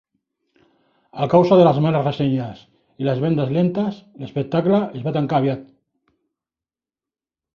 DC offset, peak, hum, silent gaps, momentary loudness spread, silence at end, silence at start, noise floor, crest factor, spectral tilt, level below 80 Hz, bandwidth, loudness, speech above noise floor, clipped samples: under 0.1%; -2 dBFS; none; none; 15 LU; 1.9 s; 1.15 s; under -90 dBFS; 18 dB; -9.5 dB/octave; -58 dBFS; 6.8 kHz; -19 LUFS; over 72 dB; under 0.1%